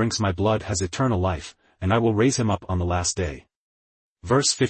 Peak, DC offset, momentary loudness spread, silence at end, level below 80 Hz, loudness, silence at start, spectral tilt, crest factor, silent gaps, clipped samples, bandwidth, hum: -8 dBFS; under 0.1%; 11 LU; 0 s; -48 dBFS; -23 LUFS; 0 s; -4.5 dB/octave; 16 dB; 3.56-4.16 s; under 0.1%; 8.8 kHz; none